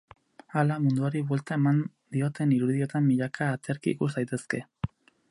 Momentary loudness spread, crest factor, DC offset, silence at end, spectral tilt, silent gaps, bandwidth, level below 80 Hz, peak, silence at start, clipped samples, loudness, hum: 8 LU; 18 dB; under 0.1%; 0.45 s; -8 dB/octave; none; 11.5 kHz; -60 dBFS; -10 dBFS; 0.55 s; under 0.1%; -28 LUFS; none